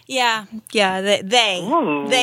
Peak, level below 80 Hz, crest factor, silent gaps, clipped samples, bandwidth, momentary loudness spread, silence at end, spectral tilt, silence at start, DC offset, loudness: 0 dBFS; -70 dBFS; 18 dB; none; under 0.1%; 16.5 kHz; 5 LU; 0 s; -2.5 dB/octave; 0.1 s; under 0.1%; -18 LUFS